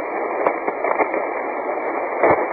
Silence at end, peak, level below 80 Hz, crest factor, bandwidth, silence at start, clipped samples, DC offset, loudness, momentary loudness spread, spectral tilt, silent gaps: 0 s; -4 dBFS; -56 dBFS; 18 dB; 4.6 kHz; 0 s; under 0.1%; under 0.1%; -21 LUFS; 6 LU; -11.5 dB/octave; none